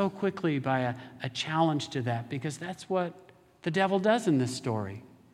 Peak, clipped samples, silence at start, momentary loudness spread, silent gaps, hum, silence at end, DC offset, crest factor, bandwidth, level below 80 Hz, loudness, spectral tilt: -10 dBFS; under 0.1%; 0 s; 12 LU; none; none; 0.25 s; under 0.1%; 20 dB; 14 kHz; -72 dBFS; -30 LUFS; -6 dB/octave